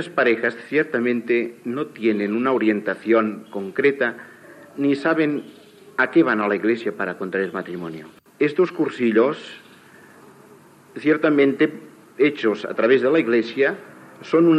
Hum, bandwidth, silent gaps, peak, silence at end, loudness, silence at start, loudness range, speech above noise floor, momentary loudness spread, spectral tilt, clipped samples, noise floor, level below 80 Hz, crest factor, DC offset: none; 9.8 kHz; none; -4 dBFS; 0 s; -21 LUFS; 0 s; 3 LU; 28 dB; 13 LU; -7 dB/octave; under 0.1%; -48 dBFS; -78 dBFS; 16 dB; under 0.1%